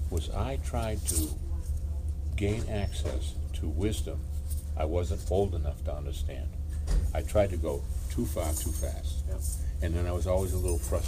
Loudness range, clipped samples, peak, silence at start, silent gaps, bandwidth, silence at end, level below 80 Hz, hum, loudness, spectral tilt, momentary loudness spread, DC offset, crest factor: 2 LU; under 0.1%; -14 dBFS; 0 s; none; 15.5 kHz; 0 s; -34 dBFS; none; -32 LUFS; -5.5 dB/octave; 6 LU; under 0.1%; 16 dB